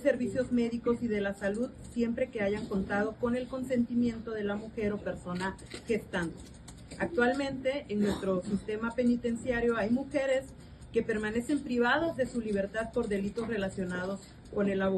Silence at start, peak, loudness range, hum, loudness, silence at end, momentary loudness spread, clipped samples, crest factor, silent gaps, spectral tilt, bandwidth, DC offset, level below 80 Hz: 0 s; -14 dBFS; 3 LU; none; -32 LUFS; 0 s; 8 LU; under 0.1%; 18 dB; none; -6 dB/octave; 12 kHz; under 0.1%; -54 dBFS